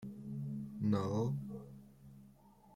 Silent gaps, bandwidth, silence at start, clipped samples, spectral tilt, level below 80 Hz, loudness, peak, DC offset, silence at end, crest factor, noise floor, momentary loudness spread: none; 12 kHz; 0 s; under 0.1%; -8.5 dB/octave; -66 dBFS; -39 LUFS; -22 dBFS; under 0.1%; 0 s; 18 dB; -63 dBFS; 24 LU